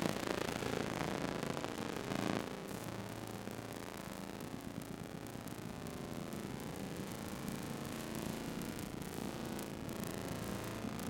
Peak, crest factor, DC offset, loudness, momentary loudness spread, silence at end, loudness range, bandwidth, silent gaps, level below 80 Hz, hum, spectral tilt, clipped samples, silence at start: -16 dBFS; 28 dB; under 0.1%; -43 LUFS; 7 LU; 0 s; 5 LU; 17 kHz; none; -62 dBFS; none; -5 dB/octave; under 0.1%; 0 s